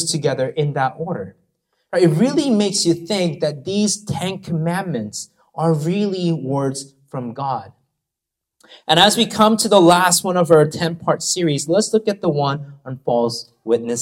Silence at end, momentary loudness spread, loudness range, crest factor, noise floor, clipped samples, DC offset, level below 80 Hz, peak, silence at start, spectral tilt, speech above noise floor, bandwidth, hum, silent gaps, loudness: 0 s; 15 LU; 8 LU; 18 dB; -83 dBFS; under 0.1%; under 0.1%; -60 dBFS; 0 dBFS; 0 s; -4.5 dB/octave; 65 dB; 17 kHz; none; none; -18 LUFS